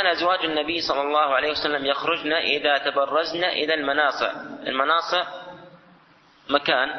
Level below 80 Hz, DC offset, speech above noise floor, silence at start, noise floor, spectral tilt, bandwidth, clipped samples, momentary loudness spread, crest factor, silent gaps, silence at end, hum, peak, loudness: -60 dBFS; under 0.1%; 32 dB; 0 s; -55 dBFS; -3.5 dB/octave; 6.4 kHz; under 0.1%; 7 LU; 20 dB; none; 0 s; none; -4 dBFS; -22 LUFS